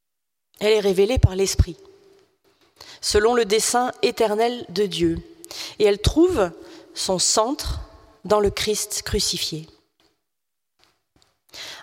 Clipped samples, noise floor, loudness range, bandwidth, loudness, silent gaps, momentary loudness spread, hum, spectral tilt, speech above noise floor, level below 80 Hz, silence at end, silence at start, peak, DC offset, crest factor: under 0.1%; -84 dBFS; 4 LU; 16.5 kHz; -21 LUFS; none; 14 LU; none; -4 dB/octave; 63 dB; -36 dBFS; 0 s; 0.6 s; -2 dBFS; under 0.1%; 20 dB